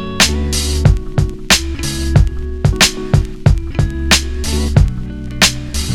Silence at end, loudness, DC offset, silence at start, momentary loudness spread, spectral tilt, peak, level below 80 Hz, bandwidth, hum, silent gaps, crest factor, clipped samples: 0 s; -14 LUFS; under 0.1%; 0 s; 7 LU; -3.5 dB/octave; 0 dBFS; -20 dBFS; over 20 kHz; none; none; 14 dB; 0.2%